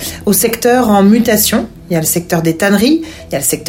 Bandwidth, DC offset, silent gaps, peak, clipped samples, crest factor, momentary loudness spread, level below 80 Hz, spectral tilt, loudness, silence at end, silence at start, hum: 17 kHz; under 0.1%; none; 0 dBFS; under 0.1%; 12 dB; 8 LU; -40 dBFS; -4 dB/octave; -11 LUFS; 0 s; 0 s; none